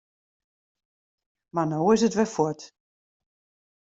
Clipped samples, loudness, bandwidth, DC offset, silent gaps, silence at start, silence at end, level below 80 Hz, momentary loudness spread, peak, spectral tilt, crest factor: under 0.1%; -24 LUFS; 8 kHz; under 0.1%; none; 1.55 s; 1.2 s; -66 dBFS; 11 LU; -8 dBFS; -6 dB/octave; 20 dB